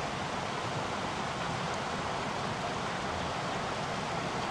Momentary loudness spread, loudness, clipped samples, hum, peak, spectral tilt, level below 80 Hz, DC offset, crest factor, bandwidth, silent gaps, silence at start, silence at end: 1 LU; -34 LUFS; under 0.1%; none; -22 dBFS; -4 dB/octave; -56 dBFS; under 0.1%; 14 dB; 13 kHz; none; 0 s; 0 s